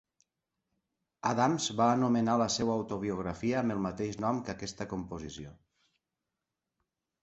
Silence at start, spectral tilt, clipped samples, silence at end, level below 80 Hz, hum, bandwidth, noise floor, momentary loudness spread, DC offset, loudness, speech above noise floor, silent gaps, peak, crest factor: 1.25 s; -5 dB/octave; under 0.1%; 1.7 s; -60 dBFS; none; 8.2 kHz; -88 dBFS; 13 LU; under 0.1%; -31 LUFS; 57 dB; none; -14 dBFS; 20 dB